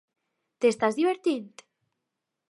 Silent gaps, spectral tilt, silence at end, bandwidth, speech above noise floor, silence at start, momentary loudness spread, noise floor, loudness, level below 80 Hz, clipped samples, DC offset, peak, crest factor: none; -4.5 dB/octave; 1.05 s; 11.5 kHz; 59 dB; 0.6 s; 5 LU; -84 dBFS; -26 LUFS; -78 dBFS; under 0.1%; under 0.1%; -10 dBFS; 20 dB